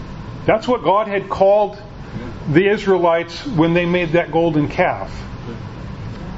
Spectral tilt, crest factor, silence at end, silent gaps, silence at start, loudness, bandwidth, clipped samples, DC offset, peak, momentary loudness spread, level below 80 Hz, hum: -7.5 dB/octave; 18 dB; 0 s; none; 0 s; -17 LUFS; 8 kHz; under 0.1%; under 0.1%; 0 dBFS; 16 LU; -38 dBFS; none